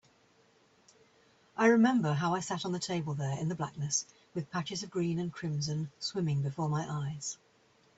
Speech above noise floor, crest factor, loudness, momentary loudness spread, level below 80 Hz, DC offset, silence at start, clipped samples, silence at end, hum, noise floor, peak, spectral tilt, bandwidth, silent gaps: 35 dB; 18 dB; -33 LUFS; 11 LU; -70 dBFS; under 0.1%; 1.55 s; under 0.1%; 0.65 s; none; -66 dBFS; -14 dBFS; -5 dB/octave; 8.2 kHz; none